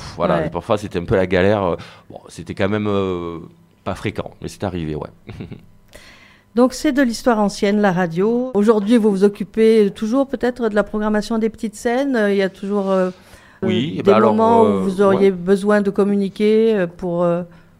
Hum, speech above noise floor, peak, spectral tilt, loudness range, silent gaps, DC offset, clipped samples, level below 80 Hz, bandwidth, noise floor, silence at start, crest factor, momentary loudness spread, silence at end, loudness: none; 29 dB; 0 dBFS; -6.5 dB/octave; 9 LU; none; under 0.1%; under 0.1%; -44 dBFS; 15 kHz; -46 dBFS; 0 s; 18 dB; 14 LU; 0.35 s; -17 LUFS